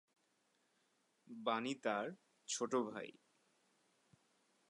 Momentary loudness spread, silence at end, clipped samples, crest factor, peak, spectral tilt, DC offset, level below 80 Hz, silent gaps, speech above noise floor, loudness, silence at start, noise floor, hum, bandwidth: 15 LU; 1.6 s; under 0.1%; 22 dB; -24 dBFS; -3 dB/octave; under 0.1%; under -90 dBFS; none; 39 dB; -42 LUFS; 1.3 s; -80 dBFS; none; 11 kHz